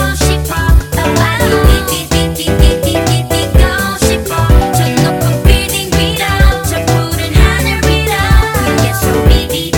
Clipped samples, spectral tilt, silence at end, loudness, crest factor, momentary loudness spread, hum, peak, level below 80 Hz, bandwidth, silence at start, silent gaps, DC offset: 2%; -5 dB/octave; 0 s; -11 LUFS; 10 dB; 3 LU; none; 0 dBFS; -14 dBFS; 19.5 kHz; 0 s; none; under 0.1%